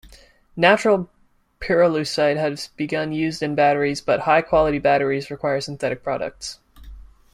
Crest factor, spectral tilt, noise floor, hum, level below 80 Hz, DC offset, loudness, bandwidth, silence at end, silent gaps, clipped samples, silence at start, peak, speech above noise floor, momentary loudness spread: 20 dB; -5 dB/octave; -51 dBFS; none; -46 dBFS; under 0.1%; -20 LUFS; 14.5 kHz; 0.3 s; none; under 0.1%; 0.05 s; -2 dBFS; 31 dB; 12 LU